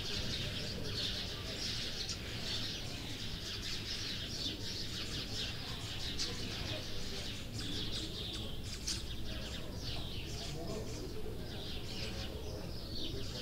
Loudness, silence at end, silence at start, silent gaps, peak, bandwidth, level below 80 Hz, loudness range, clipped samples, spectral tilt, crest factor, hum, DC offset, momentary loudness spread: -40 LUFS; 0 s; 0 s; none; -24 dBFS; 16 kHz; -48 dBFS; 4 LU; under 0.1%; -3.5 dB/octave; 16 dB; none; under 0.1%; 6 LU